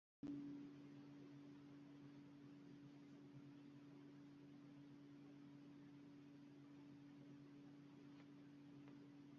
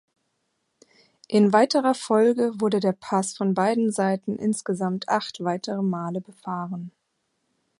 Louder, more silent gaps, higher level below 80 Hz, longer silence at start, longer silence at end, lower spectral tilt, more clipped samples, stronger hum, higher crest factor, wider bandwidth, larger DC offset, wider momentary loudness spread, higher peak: second, -62 LUFS vs -24 LUFS; neither; second, under -90 dBFS vs -74 dBFS; second, 0.25 s vs 1.3 s; second, 0 s vs 0.9 s; first, -7 dB/octave vs -5.5 dB/octave; neither; neither; about the same, 18 dB vs 20 dB; second, 7 kHz vs 11.5 kHz; neither; second, 6 LU vs 13 LU; second, -44 dBFS vs -4 dBFS